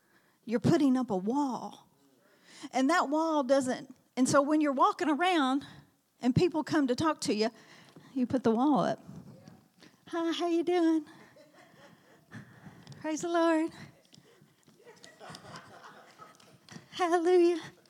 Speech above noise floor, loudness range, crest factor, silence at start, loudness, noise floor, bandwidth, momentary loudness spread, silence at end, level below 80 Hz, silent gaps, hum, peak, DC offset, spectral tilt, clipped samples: 37 dB; 7 LU; 18 dB; 0.45 s; -29 LUFS; -65 dBFS; 14.5 kHz; 23 LU; 0.2 s; -72 dBFS; none; none; -12 dBFS; under 0.1%; -5.5 dB/octave; under 0.1%